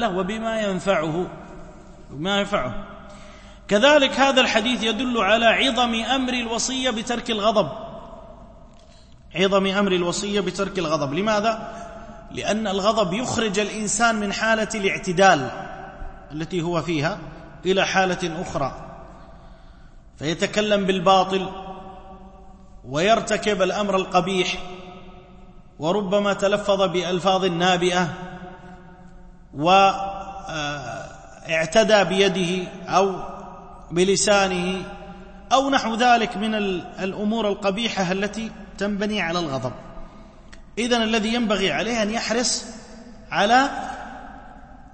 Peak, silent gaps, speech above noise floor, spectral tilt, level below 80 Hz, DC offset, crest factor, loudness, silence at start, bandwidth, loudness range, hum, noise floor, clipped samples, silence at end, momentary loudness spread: -2 dBFS; none; 26 dB; -4 dB/octave; -46 dBFS; under 0.1%; 20 dB; -21 LUFS; 0 s; 8.8 kHz; 5 LU; none; -47 dBFS; under 0.1%; 0.05 s; 21 LU